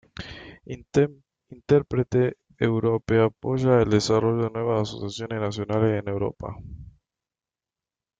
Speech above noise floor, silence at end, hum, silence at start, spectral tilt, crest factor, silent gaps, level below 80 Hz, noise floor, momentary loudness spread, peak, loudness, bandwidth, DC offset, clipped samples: over 67 dB; 1.3 s; none; 0.15 s; -7 dB/octave; 20 dB; none; -52 dBFS; under -90 dBFS; 19 LU; -6 dBFS; -24 LUFS; 9 kHz; under 0.1%; under 0.1%